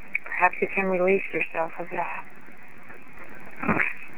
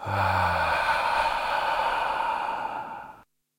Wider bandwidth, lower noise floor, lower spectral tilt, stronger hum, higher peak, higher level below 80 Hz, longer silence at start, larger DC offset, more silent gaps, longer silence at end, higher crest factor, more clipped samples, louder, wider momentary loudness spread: first, 18.5 kHz vs 16.5 kHz; about the same, -49 dBFS vs -51 dBFS; first, -7.5 dB/octave vs -4 dB/octave; neither; first, -4 dBFS vs -12 dBFS; second, -60 dBFS vs -52 dBFS; about the same, 0 s vs 0 s; first, 2% vs under 0.1%; neither; second, 0 s vs 0.4 s; first, 22 dB vs 16 dB; neither; about the same, -26 LUFS vs -26 LUFS; first, 22 LU vs 12 LU